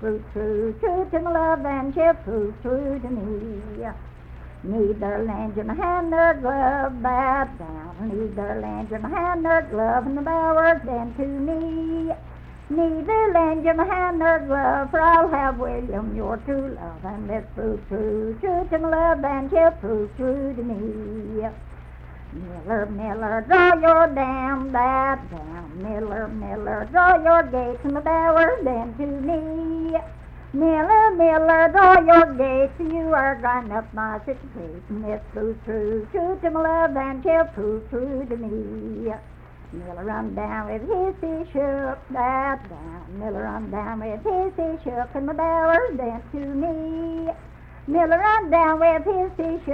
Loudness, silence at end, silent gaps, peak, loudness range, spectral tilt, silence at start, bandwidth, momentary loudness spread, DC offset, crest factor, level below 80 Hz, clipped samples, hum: -22 LUFS; 0 s; none; -2 dBFS; 10 LU; -8.5 dB/octave; 0 s; 5.4 kHz; 16 LU; under 0.1%; 20 dB; -40 dBFS; under 0.1%; none